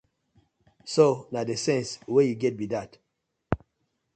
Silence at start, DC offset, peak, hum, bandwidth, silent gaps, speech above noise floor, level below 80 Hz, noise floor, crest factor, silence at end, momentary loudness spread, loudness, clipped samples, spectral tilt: 0.85 s; under 0.1%; -6 dBFS; none; 9.2 kHz; none; 54 dB; -54 dBFS; -79 dBFS; 22 dB; 0.6 s; 11 LU; -26 LUFS; under 0.1%; -5.5 dB/octave